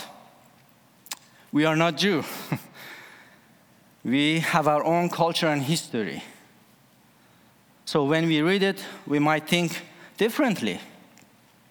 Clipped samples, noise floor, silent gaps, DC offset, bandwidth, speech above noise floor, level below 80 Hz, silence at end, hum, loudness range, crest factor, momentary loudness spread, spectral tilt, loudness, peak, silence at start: under 0.1%; -58 dBFS; none; under 0.1%; over 20 kHz; 34 dB; -74 dBFS; 0.8 s; none; 3 LU; 20 dB; 17 LU; -5 dB/octave; -24 LUFS; -6 dBFS; 0 s